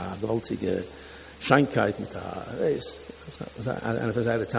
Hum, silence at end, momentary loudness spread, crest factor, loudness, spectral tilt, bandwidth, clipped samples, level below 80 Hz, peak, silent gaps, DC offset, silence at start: none; 0 s; 19 LU; 24 dB; -28 LUFS; -10.5 dB/octave; 4 kHz; under 0.1%; -52 dBFS; -2 dBFS; none; under 0.1%; 0 s